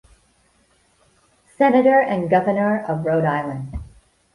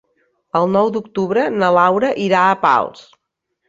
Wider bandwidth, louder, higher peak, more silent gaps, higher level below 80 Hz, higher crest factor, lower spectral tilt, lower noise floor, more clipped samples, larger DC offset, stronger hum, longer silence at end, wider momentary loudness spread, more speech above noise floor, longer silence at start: first, 11.5 kHz vs 7.8 kHz; about the same, -18 LUFS vs -16 LUFS; about the same, -4 dBFS vs -2 dBFS; neither; first, -46 dBFS vs -60 dBFS; about the same, 18 dB vs 16 dB; first, -8.5 dB/octave vs -6.5 dB/octave; second, -60 dBFS vs -74 dBFS; neither; neither; neither; second, 0.5 s vs 0.75 s; first, 15 LU vs 7 LU; second, 42 dB vs 59 dB; first, 1.6 s vs 0.55 s